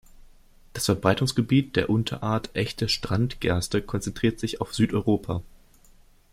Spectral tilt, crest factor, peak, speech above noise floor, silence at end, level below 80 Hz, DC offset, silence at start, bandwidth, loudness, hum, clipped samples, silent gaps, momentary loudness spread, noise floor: -5.5 dB/octave; 22 dB; -4 dBFS; 30 dB; 0.9 s; -46 dBFS; under 0.1%; 0.2 s; 16.5 kHz; -25 LUFS; none; under 0.1%; none; 7 LU; -54 dBFS